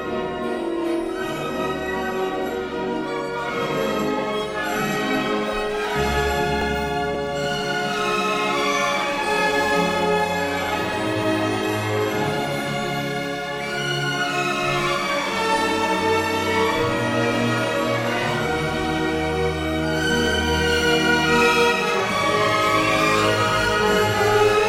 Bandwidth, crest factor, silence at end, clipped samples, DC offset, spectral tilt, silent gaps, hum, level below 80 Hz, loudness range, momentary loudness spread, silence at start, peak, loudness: 16 kHz; 16 dB; 0 s; under 0.1%; under 0.1%; -4 dB/octave; none; none; -40 dBFS; 6 LU; 7 LU; 0 s; -6 dBFS; -21 LUFS